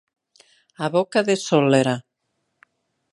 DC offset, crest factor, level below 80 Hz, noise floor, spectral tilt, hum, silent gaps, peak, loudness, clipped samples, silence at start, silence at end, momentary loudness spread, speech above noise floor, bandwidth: under 0.1%; 20 dB; -70 dBFS; -75 dBFS; -5.5 dB/octave; none; none; -2 dBFS; -20 LUFS; under 0.1%; 0.8 s; 1.15 s; 10 LU; 56 dB; 11.5 kHz